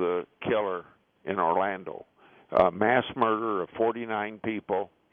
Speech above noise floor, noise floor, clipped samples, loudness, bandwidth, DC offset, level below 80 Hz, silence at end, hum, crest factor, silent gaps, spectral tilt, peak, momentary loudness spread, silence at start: 30 dB; -58 dBFS; under 0.1%; -28 LUFS; 4.9 kHz; under 0.1%; -62 dBFS; 0.25 s; none; 20 dB; none; -8.5 dB/octave; -8 dBFS; 12 LU; 0 s